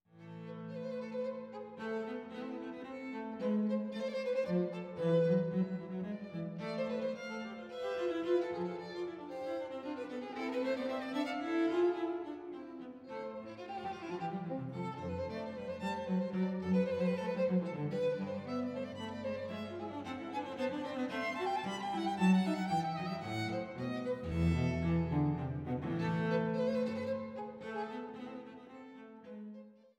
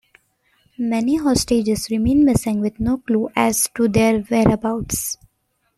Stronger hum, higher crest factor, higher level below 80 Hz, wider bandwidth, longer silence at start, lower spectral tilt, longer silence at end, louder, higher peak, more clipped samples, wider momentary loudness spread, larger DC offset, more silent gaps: neither; about the same, 18 dB vs 16 dB; second, -60 dBFS vs -40 dBFS; second, 10.5 kHz vs 15 kHz; second, 0.15 s vs 0.8 s; first, -7.5 dB/octave vs -5 dB/octave; second, 0.25 s vs 0.65 s; second, -37 LUFS vs -19 LUFS; second, -20 dBFS vs -2 dBFS; neither; first, 12 LU vs 7 LU; neither; neither